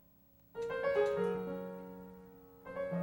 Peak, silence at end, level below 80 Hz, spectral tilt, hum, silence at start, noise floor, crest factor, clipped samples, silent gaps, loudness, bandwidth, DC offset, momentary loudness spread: -20 dBFS; 0 s; -68 dBFS; -7 dB/octave; none; 0.55 s; -65 dBFS; 18 dB; under 0.1%; none; -37 LUFS; 16 kHz; under 0.1%; 21 LU